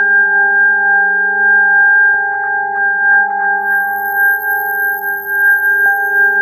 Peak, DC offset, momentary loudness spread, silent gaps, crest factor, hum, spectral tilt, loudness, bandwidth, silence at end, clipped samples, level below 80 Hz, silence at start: -2 dBFS; under 0.1%; 7 LU; none; 10 dB; none; -6 dB/octave; -10 LUFS; 14 kHz; 0 s; under 0.1%; -66 dBFS; 0 s